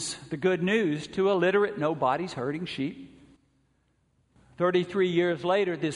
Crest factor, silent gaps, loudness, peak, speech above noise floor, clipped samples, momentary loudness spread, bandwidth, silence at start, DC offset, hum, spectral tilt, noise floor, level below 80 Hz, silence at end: 16 dB; none; -27 LUFS; -12 dBFS; 43 dB; under 0.1%; 9 LU; 10.5 kHz; 0 s; under 0.1%; none; -5.5 dB/octave; -70 dBFS; -66 dBFS; 0 s